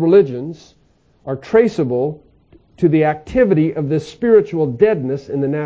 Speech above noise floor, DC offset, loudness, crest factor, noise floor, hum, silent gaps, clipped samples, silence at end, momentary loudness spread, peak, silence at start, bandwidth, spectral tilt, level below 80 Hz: 35 dB; under 0.1%; -16 LUFS; 16 dB; -50 dBFS; none; none; under 0.1%; 0 s; 14 LU; 0 dBFS; 0 s; 8 kHz; -8.5 dB/octave; -46 dBFS